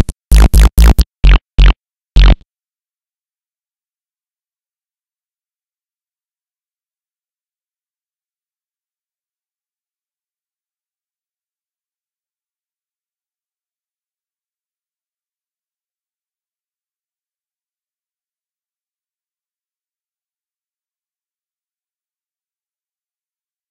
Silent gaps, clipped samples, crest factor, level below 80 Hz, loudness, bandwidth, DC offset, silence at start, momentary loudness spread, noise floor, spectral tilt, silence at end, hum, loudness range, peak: 1.97-2.01 s; under 0.1%; 18 dB; -18 dBFS; -11 LUFS; 13 kHz; under 0.1%; 0 s; 8 LU; under -90 dBFS; -5 dB/octave; 21.35 s; none; 7 LU; 0 dBFS